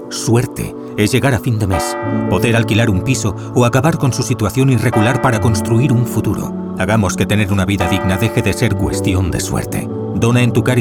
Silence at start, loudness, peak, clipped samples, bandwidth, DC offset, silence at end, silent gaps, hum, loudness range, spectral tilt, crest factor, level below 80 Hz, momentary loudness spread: 0 s; -15 LUFS; -2 dBFS; under 0.1%; 17.5 kHz; 0.2%; 0 s; none; none; 2 LU; -6 dB/octave; 14 dB; -36 dBFS; 6 LU